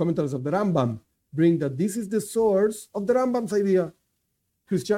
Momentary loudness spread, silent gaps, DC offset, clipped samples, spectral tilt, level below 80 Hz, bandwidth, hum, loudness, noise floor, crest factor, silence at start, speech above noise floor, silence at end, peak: 8 LU; none; under 0.1%; under 0.1%; -7 dB/octave; -62 dBFS; 16 kHz; none; -24 LUFS; -76 dBFS; 16 dB; 0 s; 52 dB; 0 s; -8 dBFS